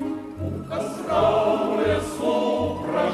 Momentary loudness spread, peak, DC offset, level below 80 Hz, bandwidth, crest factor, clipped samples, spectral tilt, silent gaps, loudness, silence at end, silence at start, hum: 11 LU; -8 dBFS; under 0.1%; -48 dBFS; 14 kHz; 16 dB; under 0.1%; -6 dB/octave; none; -24 LUFS; 0 s; 0 s; none